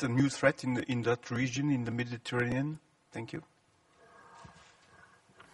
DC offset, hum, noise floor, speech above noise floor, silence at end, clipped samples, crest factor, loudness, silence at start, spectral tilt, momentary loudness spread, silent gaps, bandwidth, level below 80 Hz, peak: under 0.1%; none; -67 dBFS; 35 dB; 1 s; under 0.1%; 22 dB; -33 LUFS; 0 s; -6 dB/octave; 18 LU; none; 11.5 kHz; -66 dBFS; -12 dBFS